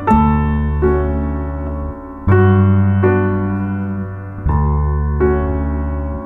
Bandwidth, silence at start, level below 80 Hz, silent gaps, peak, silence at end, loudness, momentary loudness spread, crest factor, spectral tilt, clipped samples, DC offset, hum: 3.8 kHz; 0 s; -22 dBFS; none; -2 dBFS; 0 s; -16 LUFS; 11 LU; 14 dB; -11 dB/octave; under 0.1%; under 0.1%; none